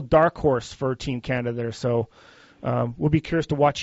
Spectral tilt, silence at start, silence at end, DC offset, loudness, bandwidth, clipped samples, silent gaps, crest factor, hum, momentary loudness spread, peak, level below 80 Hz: -6 dB/octave; 0 s; 0 s; under 0.1%; -24 LUFS; 8 kHz; under 0.1%; none; 18 dB; none; 8 LU; -6 dBFS; -46 dBFS